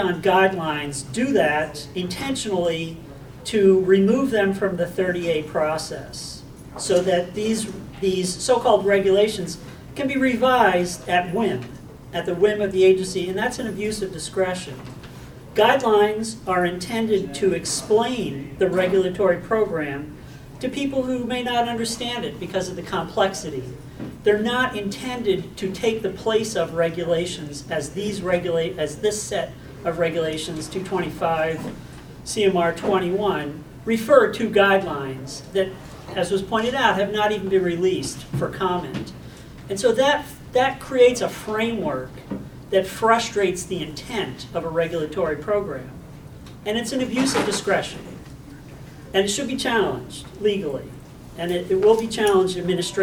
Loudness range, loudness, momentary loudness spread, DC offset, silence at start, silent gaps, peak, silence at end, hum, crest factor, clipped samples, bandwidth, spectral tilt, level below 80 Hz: 5 LU; -22 LUFS; 16 LU; under 0.1%; 0 s; none; 0 dBFS; 0 s; none; 22 dB; under 0.1%; 19 kHz; -4.5 dB/octave; -48 dBFS